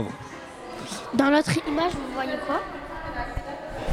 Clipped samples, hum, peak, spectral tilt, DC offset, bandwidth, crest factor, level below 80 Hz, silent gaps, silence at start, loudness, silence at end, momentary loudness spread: under 0.1%; none; -8 dBFS; -5 dB/octave; under 0.1%; 15 kHz; 18 dB; -44 dBFS; none; 0 s; -27 LUFS; 0 s; 17 LU